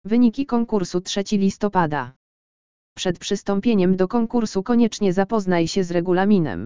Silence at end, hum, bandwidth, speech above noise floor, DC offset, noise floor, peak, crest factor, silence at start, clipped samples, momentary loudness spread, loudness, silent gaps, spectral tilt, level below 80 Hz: 0 s; none; 7.6 kHz; over 70 dB; 2%; under -90 dBFS; -4 dBFS; 16 dB; 0.05 s; under 0.1%; 6 LU; -21 LUFS; 2.16-2.96 s; -6 dB/octave; -50 dBFS